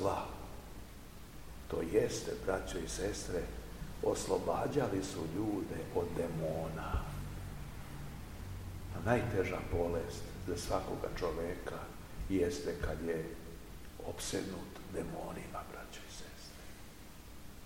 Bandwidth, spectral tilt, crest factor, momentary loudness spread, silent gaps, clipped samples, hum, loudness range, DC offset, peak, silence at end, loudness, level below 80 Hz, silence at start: 16.5 kHz; -5.5 dB/octave; 24 dB; 17 LU; none; under 0.1%; none; 6 LU; 0.2%; -14 dBFS; 0 s; -39 LUFS; -50 dBFS; 0 s